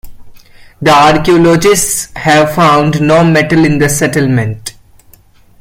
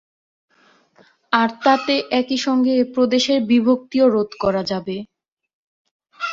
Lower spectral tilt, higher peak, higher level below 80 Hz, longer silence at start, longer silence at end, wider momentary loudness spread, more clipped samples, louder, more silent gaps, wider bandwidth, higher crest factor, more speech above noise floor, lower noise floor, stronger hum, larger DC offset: about the same, -5 dB/octave vs -4.5 dB/octave; about the same, 0 dBFS vs -2 dBFS; first, -36 dBFS vs -58 dBFS; second, 0.05 s vs 1.3 s; first, 0.9 s vs 0 s; about the same, 7 LU vs 8 LU; neither; first, -9 LUFS vs -18 LUFS; second, none vs 5.32-5.37 s, 5.53-5.85 s, 5.91-6.00 s; first, 16.5 kHz vs 7.6 kHz; second, 10 dB vs 18 dB; second, 34 dB vs 39 dB; second, -42 dBFS vs -57 dBFS; neither; neither